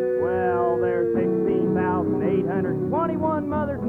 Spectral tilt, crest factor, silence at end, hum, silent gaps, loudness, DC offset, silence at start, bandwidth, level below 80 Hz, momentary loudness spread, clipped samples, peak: -10.5 dB/octave; 12 dB; 0 s; none; none; -23 LUFS; under 0.1%; 0 s; 4.3 kHz; -50 dBFS; 3 LU; under 0.1%; -10 dBFS